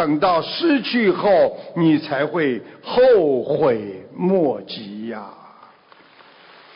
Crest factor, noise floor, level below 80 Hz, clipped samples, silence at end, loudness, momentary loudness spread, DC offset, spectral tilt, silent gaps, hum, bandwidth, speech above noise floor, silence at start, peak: 12 dB; -50 dBFS; -60 dBFS; under 0.1%; 1.4 s; -18 LUFS; 15 LU; under 0.1%; -11 dB/octave; none; none; 5.4 kHz; 31 dB; 0 s; -6 dBFS